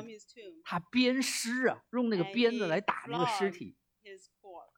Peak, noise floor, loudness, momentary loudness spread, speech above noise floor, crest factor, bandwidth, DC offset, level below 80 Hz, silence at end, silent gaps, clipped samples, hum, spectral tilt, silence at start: -12 dBFS; -55 dBFS; -31 LUFS; 21 LU; 23 dB; 20 dB; 17 kHz; under 0.1%; -80 dBFS; 0.15 s; none; under 0.1%; none; -4 dB/octave; 0 s